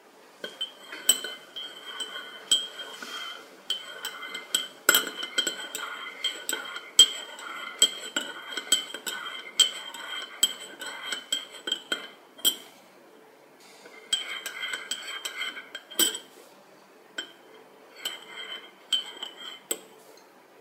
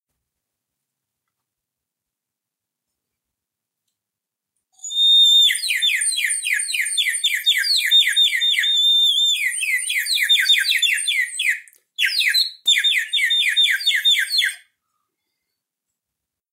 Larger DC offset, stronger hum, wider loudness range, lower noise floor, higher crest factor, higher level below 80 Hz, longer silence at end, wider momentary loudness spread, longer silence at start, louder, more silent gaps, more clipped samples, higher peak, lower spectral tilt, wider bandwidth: neither; neither; first, 9 LU vs 3 LU; second, -54 dBFS vs -85 dBFS; first, 30 dB vs 16 dB; about the same, under -90 dBFS vs under -90 dBFS; second, 0 s vs 1.95 s; first, 16 LU vs 7 LU; second, 0.05 s vs 4.85 s; second, -28 LUFS vs -15 LUFS; neither; neither; first, -2 dBFS vs -6 dBFS; first, 2 dB/octave vs 9.5 dB/octave; about the same, 17.5 kHz vs 16 kHz